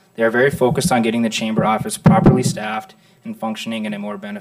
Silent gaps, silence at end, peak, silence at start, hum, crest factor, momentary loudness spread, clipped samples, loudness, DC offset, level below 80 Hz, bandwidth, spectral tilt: none; 0 s; -4 dBFS; 0.2 s; none; 14 dB; 14 LU; under 0.1%; -18 LUFS; under 0.1%; -40 dBFS; 15.5 kHz; -5.5 dB/octave